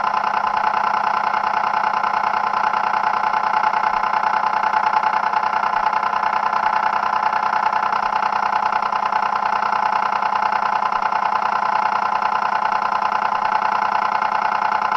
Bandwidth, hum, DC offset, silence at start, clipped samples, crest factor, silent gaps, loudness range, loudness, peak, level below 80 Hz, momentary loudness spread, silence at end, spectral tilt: 7.4 kHz; 50 Hz at -50 dBFS; under 0.1%; 0 s; under 0.1%; 16 dB; none; 1 LU; -19 LUFS; -4 dBFS; -58 dBFS; 1 LU; 0 s; -3 dB/octave